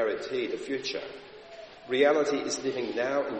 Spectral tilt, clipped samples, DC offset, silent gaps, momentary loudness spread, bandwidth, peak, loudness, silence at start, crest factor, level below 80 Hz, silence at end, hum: -3 dB/octave; under 0.1%; under 0.1%; none; 22 LU; 8.4 kHz; -10 dBFS; -29 LUFS; 0 s; 18 dB; -70 dBFS; 0 s; none